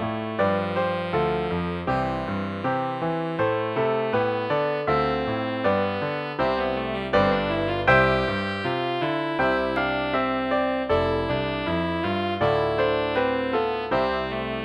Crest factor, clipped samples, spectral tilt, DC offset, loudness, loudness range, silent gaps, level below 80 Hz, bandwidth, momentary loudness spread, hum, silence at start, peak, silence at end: 18 dB; under 0.1%; -7.5 dB/octave; under 0.1%; -24 LUFS; 3 LU; none; -46 dBFS; 9.8 kHz; 5 LU; none; 0 s; -6 dBFS; 0 s